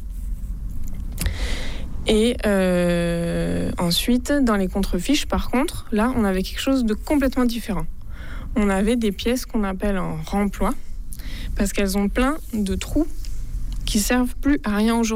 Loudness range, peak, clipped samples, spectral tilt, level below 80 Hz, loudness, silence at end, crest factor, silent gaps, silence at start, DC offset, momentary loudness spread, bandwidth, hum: 4 LU; -8 dBFS; under 0.1%; -5 dB/octave; -28 dBFS; -22 LUFS; 0 s; 14 dB; none; 0 s; under 0.1%; 14 LU; 16 kHz; none